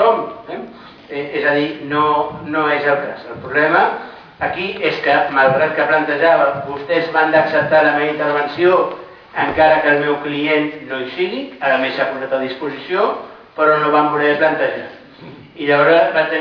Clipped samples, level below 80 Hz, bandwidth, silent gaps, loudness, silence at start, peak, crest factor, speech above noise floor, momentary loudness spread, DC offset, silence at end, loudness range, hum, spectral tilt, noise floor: under 0.1%; -56 dBFS; 5.4 kHz; none; -16 LUFS; 0 s; -2 dBFS; 16 dB; 22 dB; 14 LU; under 0.1%; 0 s; 4 LU; none; -7 dB/octave; -38 dBFS